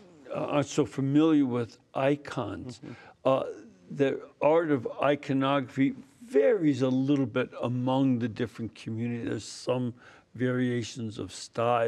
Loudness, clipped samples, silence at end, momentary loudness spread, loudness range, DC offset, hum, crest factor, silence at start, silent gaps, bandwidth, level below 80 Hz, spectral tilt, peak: -29 LUFS; under 0.1%; 0 s; 12 LU; 5 LU; under 0.1%; none; 18 dB; 0.25 s; none; 10.5 kHz; -72 dBFS; -6.5 dB/octave; -10 dBFS